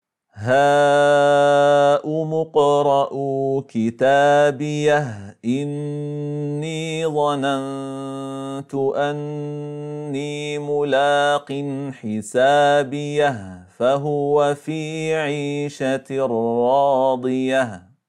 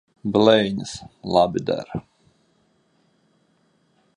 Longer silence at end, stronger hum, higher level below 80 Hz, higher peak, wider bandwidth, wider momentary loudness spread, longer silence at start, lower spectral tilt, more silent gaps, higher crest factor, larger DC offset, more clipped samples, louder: second, 0.3 s vs 2.15 s; neither; second, -70 dBFS vs -56 dBFS; second, -6 dBFS vs -2 dBFS; about the same, 11.5 kHz vs 10.5 kHz; second, 13 LU vs 18 LU; about the same, 0.35 s vs 0.25 s; about the same, -5.5 dB/octave vs -5.5 dB/octave; neither; second, 14 dB vs 22 dB; neither; neither; about the same, -20 LUFS vs -20 LUFS